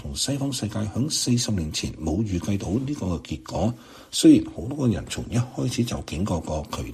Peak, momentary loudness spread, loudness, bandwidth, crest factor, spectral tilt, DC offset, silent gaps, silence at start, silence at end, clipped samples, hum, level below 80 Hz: -4 dBFS; 10 LU; -25 LUFS; 14 kHz; 20 dB; -5 dB/octave; under 0.1%; none; 0 s; 0 s; under 0.1%; none; -42 dBFS